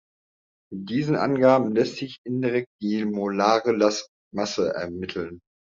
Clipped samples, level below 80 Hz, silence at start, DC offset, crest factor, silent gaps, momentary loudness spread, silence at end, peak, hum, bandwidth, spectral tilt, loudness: under 0.1%; -66 dBFS; 0.7 s; under 0.1%; 20 dB; 2.18-2.24 s, 2.66-2.79 s, 4.08-4.31 s; 14 LU; 0.4 s; -4 dBFS; none; 7.6 kHz; -5.5 dB/octave; -24 LUFS